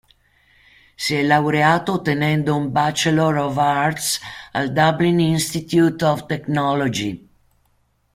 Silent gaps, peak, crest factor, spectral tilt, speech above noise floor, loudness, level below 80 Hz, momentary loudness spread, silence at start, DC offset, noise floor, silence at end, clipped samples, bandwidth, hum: none; -2 dBFS; 18 dB; -5 dB/octave; 45 dB; -19 LUFS; -54 dBFS; 8 LU; 1 s; under 0.1%; -63 dBFS; 0.95 s; under 0.1%; 16 kHz; none